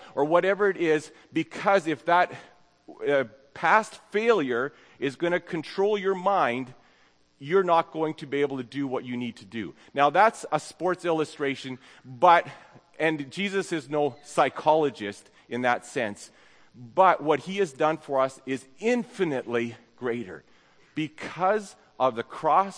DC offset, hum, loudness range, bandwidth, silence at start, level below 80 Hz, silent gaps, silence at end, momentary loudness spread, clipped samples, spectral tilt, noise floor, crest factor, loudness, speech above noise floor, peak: under 0.1%; none; 4 LU; 10.5 kHz; 0 s; -74 dBFS; none; 0 s; 13 LU; under 0.1%; -5 dB/octave; -62 dBFS; 22 dB; -26 LUFS; 36 dB; -6 dBFS